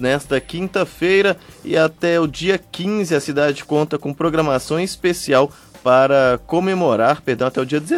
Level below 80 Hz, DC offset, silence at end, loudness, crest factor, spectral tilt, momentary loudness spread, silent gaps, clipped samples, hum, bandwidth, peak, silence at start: -48 dBFS; under 0.1%; 0 s; -18 LUFS; 16 dB; -5.5 dB/octave; 7 LU; none; under 0.1%; none; 15 kHz; -2 dBFS; 0 s